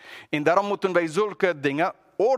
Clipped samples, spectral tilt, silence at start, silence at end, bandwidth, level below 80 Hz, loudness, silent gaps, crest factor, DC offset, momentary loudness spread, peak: under 0.1%; -5.5 dB/octave; 0.05 s; 0 s; 13 kHz; -72 dBFS; -24 LUFS; none; 18 dB; under 0.1%; 5 LU; -6 dBFS